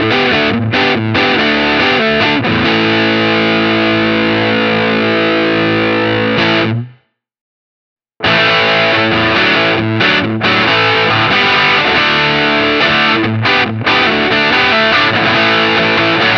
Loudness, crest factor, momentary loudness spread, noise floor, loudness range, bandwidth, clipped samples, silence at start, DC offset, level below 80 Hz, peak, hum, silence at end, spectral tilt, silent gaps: -10 LUFS; 12 dB; 3 LU; -49 dBFS; 3 LU; 6.8 kHz; under 0.1%; 0 s; under 0.1%; -42 dBFS; 0 dBFS; none; 0 s; -5.5 dB/octave; 7.41-7.96 s